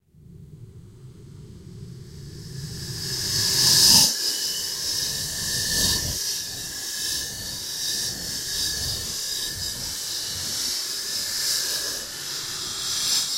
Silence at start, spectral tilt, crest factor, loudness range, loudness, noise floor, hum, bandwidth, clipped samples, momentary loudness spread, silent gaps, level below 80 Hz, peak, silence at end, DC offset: 0.15 s; -0.5 dB/octave; 24 dB; 7 LU; -22 LUFS; -47 dBFS; none; 16 kHz; under 0.1%; 16 LU; none; -48 dBFS; -2 dBFS; 0 s; under 0.1%